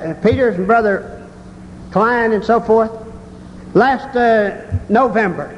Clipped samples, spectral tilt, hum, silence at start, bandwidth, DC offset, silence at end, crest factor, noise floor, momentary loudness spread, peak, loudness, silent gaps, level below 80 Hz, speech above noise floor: under 0.1%; -7.5 dB/octave; none; 0 s; 10 kHz; under 0.1%; 0 s; 14 dB; -35 dBFS; 22 LU; -2 dBFS; -15 LUFS; none; -38 dBFS; 21 dB